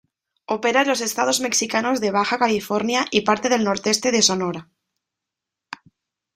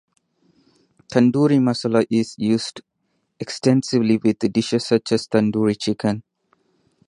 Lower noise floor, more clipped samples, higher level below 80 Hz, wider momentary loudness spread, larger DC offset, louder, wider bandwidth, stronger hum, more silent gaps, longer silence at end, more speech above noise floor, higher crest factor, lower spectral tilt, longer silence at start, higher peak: first, -85 dBFS vs -71 dBFS; neither; about the same, -64 dBFS vs -60 dBFS; first, 13 LU vs 7 LU; neither; about the same, -20 LUFS vs -20 LUFS; first, 16 kHz vs 11 kHz; neither; neither; first, 1.75 s vs 0.85 s; first, 65 dB vs 52 dB; about the same, 20 dB vs 18 dB; second, -2.5 dB/octave vs -6 dB/octave; second, 0.5 s vs 1.1 s; about the same, -2 dBFS vs -2 dBFS